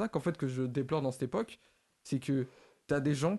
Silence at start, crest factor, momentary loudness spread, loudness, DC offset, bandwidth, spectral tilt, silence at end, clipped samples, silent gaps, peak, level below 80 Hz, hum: 0 s; 16 dB; 11 LU; -35 LUFS; under 0.1%; 12.5 kHz; -7 dB/octave; 0 s; under 0.1%; none; -18 dBFS; -66 dBFS; none